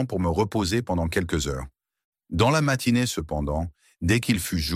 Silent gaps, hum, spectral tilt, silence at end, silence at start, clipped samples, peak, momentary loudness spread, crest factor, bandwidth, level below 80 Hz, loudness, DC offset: 2.04-2.13 s; none; -5 dB/octave; 0 s; 0 s; under 0.1%; -8 dBFS; 9 LU; 18 dB; 16.5 kHz; -38 dBFS; -25 LUFS; under 0.1%